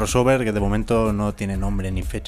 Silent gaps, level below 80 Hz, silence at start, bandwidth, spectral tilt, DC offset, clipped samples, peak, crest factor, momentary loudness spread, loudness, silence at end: none; -30 dBFS; 0 s; 15 kHz; -6 dB/octave; under 0.1%; under 0.1%; -4 dBFS; 16 dB; 8 LU; -22 LUFS; 0 s